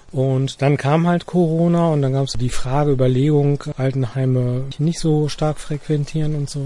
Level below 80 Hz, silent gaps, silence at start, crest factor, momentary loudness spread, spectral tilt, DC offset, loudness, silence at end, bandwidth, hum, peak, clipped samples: -36 dBFS; none; 0.1 s; 14 dB; 6 LU; -7.5 dB/octave; under 0.1%; -19 LUFS; 0 s; 11.5 kHz; none; -4 dBFS; under 0.1%